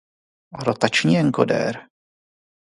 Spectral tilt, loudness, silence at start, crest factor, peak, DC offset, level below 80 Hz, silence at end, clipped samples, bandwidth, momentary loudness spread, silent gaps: -5.5 dB/octave; -20 LUFS; 0.55 s; 22 dB; 0 dBFS; under 0.1%; -62 dBFS; 0.85 s; under 0.1%; 11.5 kHz; 10 LU; none